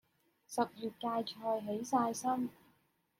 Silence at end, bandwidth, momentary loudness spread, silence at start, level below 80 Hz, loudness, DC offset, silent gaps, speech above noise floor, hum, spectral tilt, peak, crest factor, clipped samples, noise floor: 0.7 s; 16.5 kHz; 7 LU; 0.5 s; -82 dBFS; -37 LUFS; under 0.1%; none; 38 dB; none; -4.5 dB/octave; -18 dBFS; 20 dB; under 0.1%; -74 dBFS